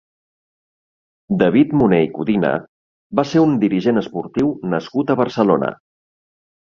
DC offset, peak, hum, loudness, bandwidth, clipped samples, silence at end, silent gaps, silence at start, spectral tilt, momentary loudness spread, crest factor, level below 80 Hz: under 0.1%; -2 dBFS; none; -18 LUFS; 7 kHz; under 0.1%; 1 s; 2.69-3.10 s; 1.3 s; -8 dB/octave; 9 LU; 16 dB; -54 dBFS